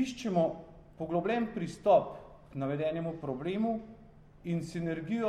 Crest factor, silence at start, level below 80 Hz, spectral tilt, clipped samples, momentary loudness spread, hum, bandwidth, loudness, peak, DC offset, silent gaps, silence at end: 20 dB; 0 s; -60 dBFS; -7 dB/octave; under 0.1%; 18 LU; none; 11.5 kHz; -33 LUFS; -12 dBFS; under 0.1%; none; 0 s